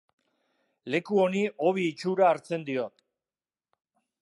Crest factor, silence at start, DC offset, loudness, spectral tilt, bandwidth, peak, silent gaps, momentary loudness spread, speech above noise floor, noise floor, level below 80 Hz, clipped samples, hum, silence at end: 18 dB; 0.85 s; under 0.1%; -27 LUFS; -6.5 dB/octave; 11.5 kHz; -10 dBFS; none; 9 LU; over 64 dB; under -90 dBFS; -82 dBFS; under 0.1%; none; 1.35 s